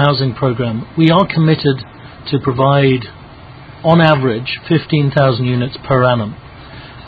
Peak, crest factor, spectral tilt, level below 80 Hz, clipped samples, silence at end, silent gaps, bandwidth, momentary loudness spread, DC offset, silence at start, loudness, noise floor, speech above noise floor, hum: 0 dBFS; 14 dB; -9.5 dB/octave; -42 dBFS; under 0.1%; 0 s; none; 5 kHz; 18 LU; under 0.1%; 0 s; -14 LUFS; -35 dBFS; 22 dB; none